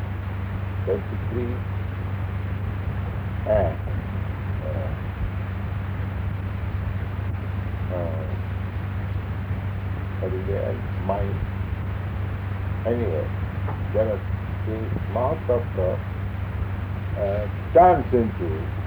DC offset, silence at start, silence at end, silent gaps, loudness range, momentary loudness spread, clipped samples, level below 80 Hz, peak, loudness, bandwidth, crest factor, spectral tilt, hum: under 0.1%; 0 s; 0 s; none; 6 LU; 6 LU; under 0.1%; -36 dBFS; -6 dBFS; -26 LUFS; over 20 kHz; 20 dB; -9.5 dB/octave; none